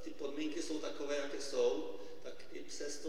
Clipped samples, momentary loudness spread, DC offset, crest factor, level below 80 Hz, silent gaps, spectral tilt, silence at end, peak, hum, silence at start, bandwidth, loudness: under 0.1%; 15 LU; 0.8%; 16 dB; -72 dBFS; none; -3 dB/octave; 0 s; -22 dBFS; none; 0 s; 16 kHz; -40 LUFS